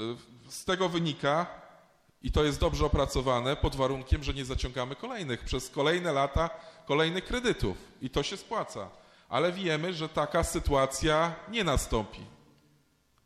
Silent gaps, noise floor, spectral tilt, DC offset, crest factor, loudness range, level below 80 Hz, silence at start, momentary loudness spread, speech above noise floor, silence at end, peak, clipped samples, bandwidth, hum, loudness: none; -68 dBFS; -5 dB/octave; under 0.1%; 18 dB; 2 LU; -40 dBFS; 0 s; 11 LU; 38 dB; 0.9 s; -12 dBFS; under 0.1%; 14.5 kHz; none; -30 LUFS